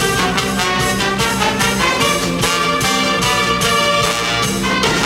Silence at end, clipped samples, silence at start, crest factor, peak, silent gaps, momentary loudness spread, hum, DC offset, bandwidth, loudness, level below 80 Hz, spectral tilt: 0 s; under 0.1%; 0 s; 14 dB; 0 dBFS; none; 2 LU; none; under 0.1%; 16.5 kHz; -14 LUFS; -36 dBFS; -3 dB/octave